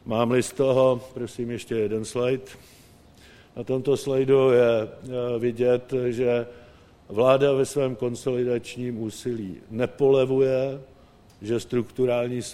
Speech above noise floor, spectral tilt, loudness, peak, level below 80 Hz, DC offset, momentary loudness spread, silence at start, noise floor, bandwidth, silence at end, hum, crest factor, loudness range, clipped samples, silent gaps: 28 dB; -6 dB/octave; -24 LUFS; -4 dBFS; -58 dBFS; under 0.1%; 12 LU; 0.05 s; -52 dBFS; 14.5 kHz; 0 s; none; 20 dB; 3 LU; under 0.1%; none